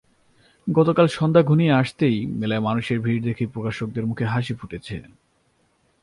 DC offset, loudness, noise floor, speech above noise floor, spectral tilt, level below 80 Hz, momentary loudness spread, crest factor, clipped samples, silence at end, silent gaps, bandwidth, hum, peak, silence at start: under 0.1%; -21 LUFS; -65 dBFS; 44 dB; -8 dB/octave; -54 dBFS; 15 LU; 18 dB; under 0.1%; 1 s; none; 11 kHz; none; -4 dBFS; 0.65 s